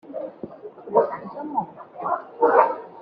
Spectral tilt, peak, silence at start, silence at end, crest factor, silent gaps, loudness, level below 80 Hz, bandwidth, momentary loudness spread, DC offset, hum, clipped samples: -5.5 dB/octave; -2 dBFS; 0.05 s; 0 s; 22 dB; none; -23 LUFS; -72 dBFS; 5 kHz; 20 LU; under 0.1%; none; under 0.1%